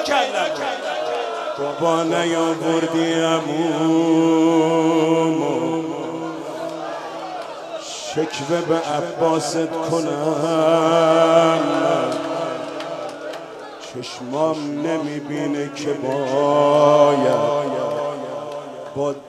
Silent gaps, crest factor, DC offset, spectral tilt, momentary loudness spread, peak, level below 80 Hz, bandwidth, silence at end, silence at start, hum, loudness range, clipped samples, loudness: none; 18 dB; under 0.1%; -5 dB/octave; 15 LU; 0 dBFS; -70 dBFS; 13 kHz; 0 s; 0 s; none; 7 LU; under 0.1%; -20 LUFS